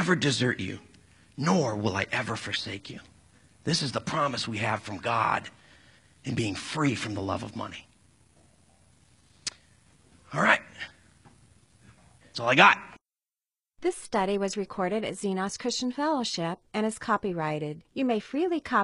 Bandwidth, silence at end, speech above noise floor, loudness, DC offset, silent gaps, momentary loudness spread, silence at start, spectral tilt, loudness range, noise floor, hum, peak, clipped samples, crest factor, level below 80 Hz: 11.5 kHz; 0 s; over 62 dB; -28 LUFS; under 0.1%; none; 14 LU; 0 s; -4.5 dB/octave; 8 LU; under -90 dBFS; none; -2 dBFS; under 0.1%; 28 dB; -64 dBFS